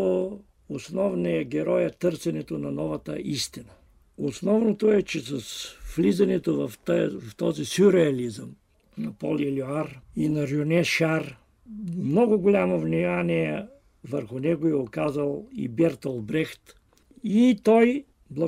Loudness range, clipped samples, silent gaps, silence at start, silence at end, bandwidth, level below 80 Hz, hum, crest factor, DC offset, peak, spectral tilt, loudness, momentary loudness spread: 4 LU; under 0.1%; none; 0 s; 0 s; 16 kHz; -56 dBFS; none; 18 dB; under 0.1%; -8 dBFS; -6.5 dB/octave; -25 LUFS; 14 LU